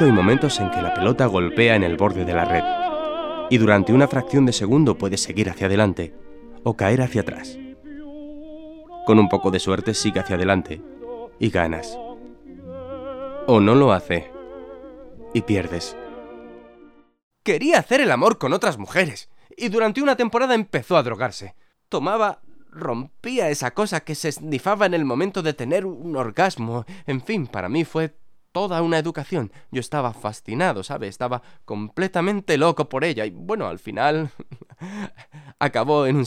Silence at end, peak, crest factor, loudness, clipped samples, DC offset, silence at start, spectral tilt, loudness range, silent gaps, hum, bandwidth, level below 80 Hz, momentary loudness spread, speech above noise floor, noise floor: 0 s; 0 dBFS; 22 dB; -21 LUFS; under 0.1%; under 0.1%; 0 s; -5.5 dB/octave; 6 LU; 17.23-17.31 s; none; 15.5 kHz; -50 dBFS; 20 LU; 30 dB; -50 dBFS